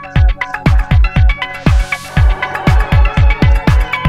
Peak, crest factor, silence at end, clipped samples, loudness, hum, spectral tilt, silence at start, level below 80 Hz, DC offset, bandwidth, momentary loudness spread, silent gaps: 0 dBFS; 10 dB; 0 s; 0.2%; -13 LUFS; none; -6.5 dB/octave; 0 s; -12 dBFS; under 0.1%; 12 kHz; 4 LU; none